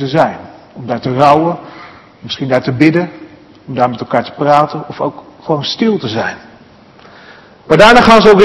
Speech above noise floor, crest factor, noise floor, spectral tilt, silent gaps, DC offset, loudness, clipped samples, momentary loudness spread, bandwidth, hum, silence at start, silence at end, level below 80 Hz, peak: 30 dB; 12 dB; -41 dBFS; -6 dB/octave; none; under 0.1%; -11 LUFS; 2%; 19 LU; 12 kHz; none; 0 s; 0 s; -40 dBFS; 0 dBFS